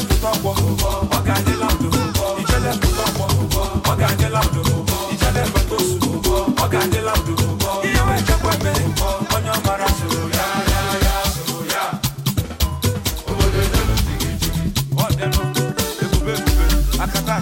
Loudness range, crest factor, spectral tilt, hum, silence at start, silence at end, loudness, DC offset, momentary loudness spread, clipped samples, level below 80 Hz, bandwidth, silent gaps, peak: 2 LU; 14 dB; -4.5 dB/octave; none; 0 s; 0 s; -19 LUFS; under 0.1%; 4 LU; under 0.1%; -24 dBFS; 17 kHz; none; -4 dBFS